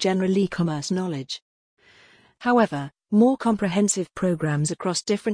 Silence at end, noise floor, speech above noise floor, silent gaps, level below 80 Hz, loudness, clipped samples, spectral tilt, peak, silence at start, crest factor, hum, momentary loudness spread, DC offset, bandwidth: 0 s; -55 dBFS; 33 dB; 1.42-1.77 s; -60 dBFS; -23 LUFS; under 0.1%; -5 dB/octave; -8 dBFS; 0 s; 16 dB; none; 10 LU; under 0.1%; 10.5 kHz